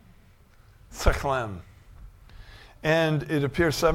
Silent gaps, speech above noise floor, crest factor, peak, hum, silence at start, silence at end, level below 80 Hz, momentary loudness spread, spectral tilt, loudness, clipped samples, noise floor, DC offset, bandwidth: none; 30 dB; 24 dB; -4 dBFS; none; 0.9 s; 0 s; -36 dBFS; 13 LU; -5.5 dB/octave; -26 LUFS; under 0.1%; -55 dBFS; under 0.1%; 16.5 kHz